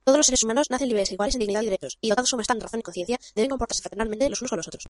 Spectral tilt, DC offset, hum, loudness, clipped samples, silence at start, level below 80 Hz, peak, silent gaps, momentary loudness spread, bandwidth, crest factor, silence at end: -2.5 dB/octave; under 0.1%; none; -24 LUFS; under 0.1%; 0.05 s; -44 dBFS; -6 dBFS; none; 10 LU; 11.5 kHz; 20 dB; 0 s